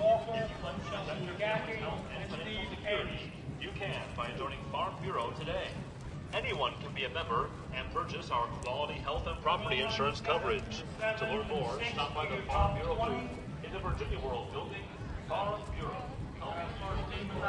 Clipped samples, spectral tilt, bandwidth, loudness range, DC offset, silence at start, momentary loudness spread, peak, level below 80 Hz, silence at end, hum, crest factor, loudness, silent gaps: under 0.1%; -5.5 dB/octave; 11.5 kHz; 5 LU; under 0.1%; 0 s; 9 LU; -16 dBFS; -48 dBFS; 0 s; none; 18 dB; -36 LUFS; none